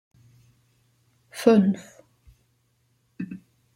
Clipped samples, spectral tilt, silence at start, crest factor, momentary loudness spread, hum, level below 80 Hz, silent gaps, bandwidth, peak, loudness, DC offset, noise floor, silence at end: under 0.1%; -7 dB/octave; 1.35 s; 24 dB; 23 LU; none; -66 dBFS; none; 15.5 kHz; -4 dBFS; -23 LUFS; under 0.1%; -68 dBFS; 0.4 s